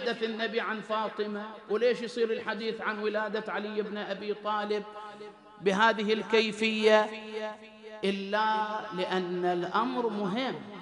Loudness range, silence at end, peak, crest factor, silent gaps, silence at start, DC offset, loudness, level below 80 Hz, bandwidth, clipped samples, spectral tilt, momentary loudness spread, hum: 5 LU; 0 s; -10 dBFS; 20 dB; none; 0 s; under 0.1%; -30 LUFS; -78 dBFS; 11.5 kHz; under 0.1%; -5 dB/octave; 12 LU; none